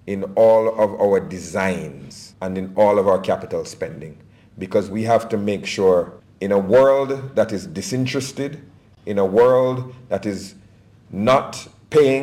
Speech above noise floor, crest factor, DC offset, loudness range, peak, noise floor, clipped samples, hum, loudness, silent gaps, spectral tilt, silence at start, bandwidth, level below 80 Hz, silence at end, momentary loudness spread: 30 dB; 14 dB; under 0.1%; 3 LU; -6 dBFS; -49 dBFS; under 0.1%; none; -19 LUFS; none; -6 dB/octave; 0.05 s; 15 kHz; -58 dBFS; 0 s; 18 LU